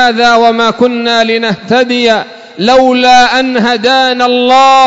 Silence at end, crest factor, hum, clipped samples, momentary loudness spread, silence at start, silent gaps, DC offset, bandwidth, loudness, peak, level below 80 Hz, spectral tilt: 0 s; 8 dB; none; 0.2%; 5 LU; 0 s; none; under 0.1%; 8 kHz; -8 LUFS; 0 dBFS; -46 dBFS; -3.5 dB/octave